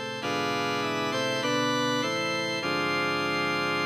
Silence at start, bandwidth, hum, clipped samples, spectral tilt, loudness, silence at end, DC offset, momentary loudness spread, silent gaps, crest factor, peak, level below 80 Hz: 0 s; 16 kHz; none; under 0.1%; -3.5 dB/octave; -27 LUFS; 0 s; under 0.1%; 2 LU; none; 12 dB; -16 dBFS; -74 dBFS